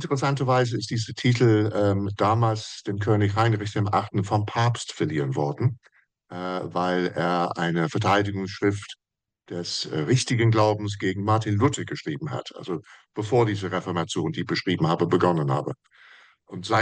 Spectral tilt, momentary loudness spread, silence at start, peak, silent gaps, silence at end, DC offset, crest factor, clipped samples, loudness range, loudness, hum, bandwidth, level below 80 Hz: -6 dB/octave; 12 LU; 0 s; -8 dBFS; none; 0 s; under 0.1%; 16 dB; under 0.1%; 3 LU; -24 LUFS; none; 9.8 kHz; -64 dBFS